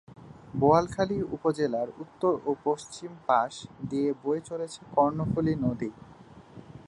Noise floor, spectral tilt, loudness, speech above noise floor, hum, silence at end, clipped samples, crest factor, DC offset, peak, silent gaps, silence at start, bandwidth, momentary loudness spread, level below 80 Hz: -49 dBFS; -7 dB/octave; -28 LUFS; 21 dB; none; 0.05 s; under 0.1%; 22 dB; under 0.1%; -8 dBFS; none; 0.1 s; 11.5 kHz; 13 LU; -56 dBFS